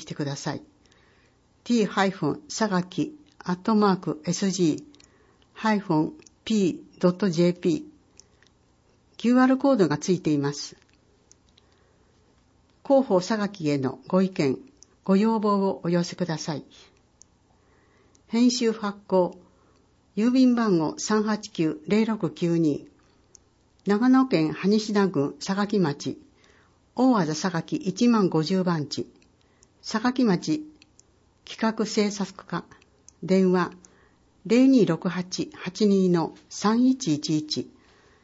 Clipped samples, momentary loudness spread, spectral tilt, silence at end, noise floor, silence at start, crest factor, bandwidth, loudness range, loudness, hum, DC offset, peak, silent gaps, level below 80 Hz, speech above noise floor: under 0.1%; 13 LU; -6 dB/octave; 0.6 s; -62 dBFS; 0 s; 16 dB; 8 kHz; 4 LU; -24 LUFS; 60 Hz at -50 dBFS; under 0.1%; -8 dBFS; none; -66 dBFS; 39 dB